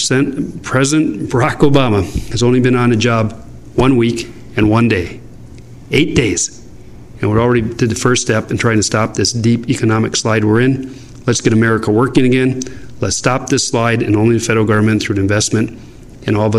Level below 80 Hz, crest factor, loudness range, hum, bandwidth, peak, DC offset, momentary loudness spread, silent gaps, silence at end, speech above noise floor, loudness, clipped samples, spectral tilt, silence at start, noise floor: -36 dBFS; 14 dB; 2 LU; none; 13 kHz; 0 dBFS; under 0.1%; 10 LU; none; 0 s; 23 dB; -14 LUFS; under 0.1%; -5 dB/octave; 0 s; -36 dBFS